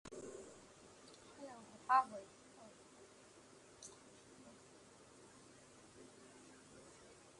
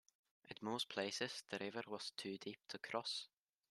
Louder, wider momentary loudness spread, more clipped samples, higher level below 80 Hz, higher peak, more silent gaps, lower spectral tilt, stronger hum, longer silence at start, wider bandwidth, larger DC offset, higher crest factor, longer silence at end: first, -42 LUFS vs -46 LUFS; first, 21 LU vs 8 LU; neither; first, -80 dBFS vs -90 dBFS; first, -20 dBFS vs -26 dBFS; neither; about the same, -3 dB/octave vs -3 dB/octave; neither; second, 0.05 s vs 0.45 s; second, 11.5 kHz vs 13.5 kHz; neither; first, 28 dB vs 22 dB; second, 0 s vs 0.45 s